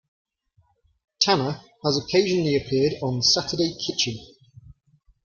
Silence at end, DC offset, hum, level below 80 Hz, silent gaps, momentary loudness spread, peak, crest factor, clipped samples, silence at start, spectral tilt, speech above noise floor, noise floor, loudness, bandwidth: 0.55 s; under 0.1%; none; -56 dBFS; none; 7 LU; -2 dBFS; 22 dB; under 0.1%; 1.2 s; -4 dB/octave; 42 dB; -65 dBFS; -22 LUFS; 7.2 kHz